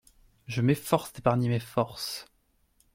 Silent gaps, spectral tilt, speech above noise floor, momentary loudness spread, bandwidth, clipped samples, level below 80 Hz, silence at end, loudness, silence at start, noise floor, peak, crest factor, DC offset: none; -6 dB/octave; 40 dB; 10 LU; 16.5 kHz; under 0.1%; -60 dBFS; 0.7 s; -29 LUFS; 0.5 s; -68 dBFS; -8 dBFS; 22 dB; under 0.1%